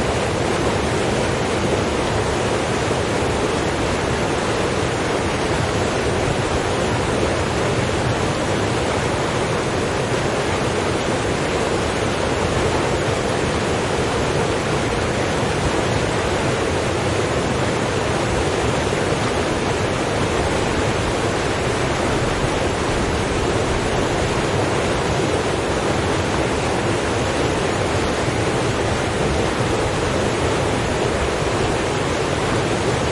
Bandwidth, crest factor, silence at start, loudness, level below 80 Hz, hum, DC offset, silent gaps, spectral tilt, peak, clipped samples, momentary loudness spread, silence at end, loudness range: 11.5 kHz; 14 dB; 0 s; -20 LUFS; -34 dBFS; none; under 0.1%; none; -5 dB/octave; -6 dBFS; under 0.1%; 1 LU; 0 s; 0 LU